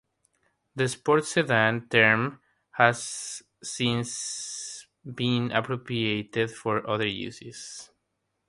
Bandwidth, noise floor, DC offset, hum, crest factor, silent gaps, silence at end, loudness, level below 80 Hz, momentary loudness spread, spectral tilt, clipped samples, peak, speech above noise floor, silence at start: 11.5 kHz; -79 dBFS; under 0.1%; none; 26 dB; none; 0.65 s; -26 LUFS; -64 dBFS; 17 LU; -4 dB/octave; under 0.1%; -2 dBFS; 52 dB; 0.75 s